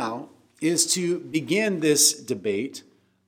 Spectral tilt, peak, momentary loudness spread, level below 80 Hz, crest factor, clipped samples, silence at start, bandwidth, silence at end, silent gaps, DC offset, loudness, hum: -2.5 dB/octave; -6 dBFS; 15 LU; -76 dBFS; 20 dB; under 0.1%; 0 s; 18 kHz; 0.5 s; none; under 0.1%; -22 LUFS; none